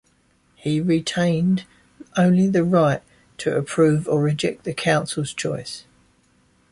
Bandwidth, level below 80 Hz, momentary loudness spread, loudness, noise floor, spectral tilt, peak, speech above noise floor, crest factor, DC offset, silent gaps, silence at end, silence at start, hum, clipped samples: 11.5 kHz; -56 dBFS; 11 LU; -21 LUFS; -61 dBFS; -6 dB/octave; -6 dBFS; 41 dB; 16 dB; under 0.1%; none; 0.9 s; 0.65 s; none; under 0.1%